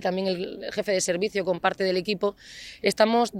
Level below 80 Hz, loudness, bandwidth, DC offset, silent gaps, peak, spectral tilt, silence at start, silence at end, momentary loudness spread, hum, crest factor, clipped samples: -62 dBFS; -26 LUFS; 16.5 kHz; under 0.1%; none; -8 dBFS; -4 dB/octave; 0 s; 0 s; 9 LU; none; 18 dB; under 0.1%